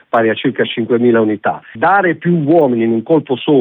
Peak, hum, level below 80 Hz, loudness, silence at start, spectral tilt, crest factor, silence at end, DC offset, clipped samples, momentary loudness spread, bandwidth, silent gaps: -2 dBFS; none; -62 dBFS; -14 LUFS; 0.15 s; -10 dB/octave; 10 dB; 0 s; under 0.1%; under 0.1%; 5 LU; 4 kHz; none